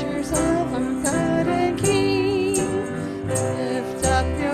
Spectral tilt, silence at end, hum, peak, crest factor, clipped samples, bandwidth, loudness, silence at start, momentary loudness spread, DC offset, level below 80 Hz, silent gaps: -5 dB/octave; 0 s; none; -6 dBFS; 14 dB; under 0.1%; 14.5 kHz; -22 LUFS; 0 s; 5 LU; under 0.1%; -38 dBFS; none